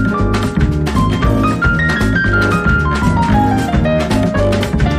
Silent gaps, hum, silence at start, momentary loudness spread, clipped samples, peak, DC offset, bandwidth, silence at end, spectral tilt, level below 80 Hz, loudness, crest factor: none; none; 0 s; 2 LU; under 0.1%; -2 dBFS; under 0.1%; 15 kHz; 0 s; -6.5 dB/octave; -20 dBFS; -14 LUFS; 12 dB